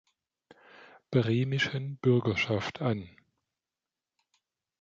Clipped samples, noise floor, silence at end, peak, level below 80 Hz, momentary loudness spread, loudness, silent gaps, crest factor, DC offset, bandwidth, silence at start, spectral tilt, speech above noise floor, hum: under 0.1%; under -90 dBFS; 1.75 s; -12 dBFS; -62 dBFS; 6 LU; -29 LUFS; none; 20 dB; under 0.1%; 7.4 kHz; 0.8 s; -6.5 dB/octave; over 62 dB; none